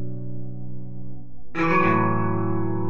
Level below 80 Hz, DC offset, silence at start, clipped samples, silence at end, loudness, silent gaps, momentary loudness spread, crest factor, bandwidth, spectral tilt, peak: -46 dBFS; 5%; 0 s; under 0.1%; 0 s; -23 LUFS; none; 20 LU; 18 dB; 6.8 kHz; -9 dB/octave; -6 dBFS